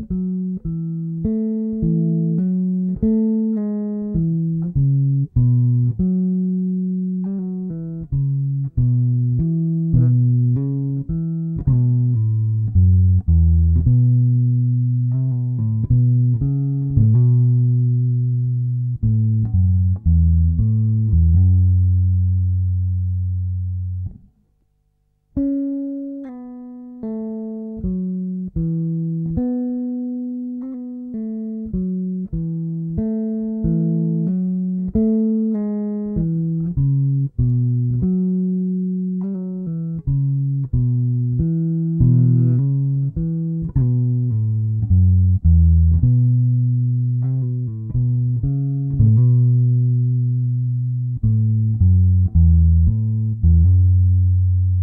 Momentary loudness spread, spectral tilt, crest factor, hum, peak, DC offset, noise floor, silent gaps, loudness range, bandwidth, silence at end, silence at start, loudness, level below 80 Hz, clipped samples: 10 LU; -16 dB/octave; 14 dB; none; -4 dBFS; under 0.1%; -64 dBFS; none; 8 LU; 1.3 kHz; 0 s; 0 s; -19 LUFS; -28 dBFS; under 0.1%